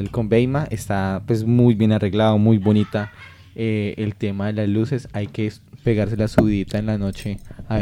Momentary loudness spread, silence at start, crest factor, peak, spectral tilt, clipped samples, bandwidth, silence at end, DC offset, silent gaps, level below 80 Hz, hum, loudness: 11 LU; 0 s; 16 dB; -2 dBFS; -8 dB/octave; under 0.1%; 12.5 kHz; 0 s; under 0.1%; none; -42 dBFS; none; -20 LUFS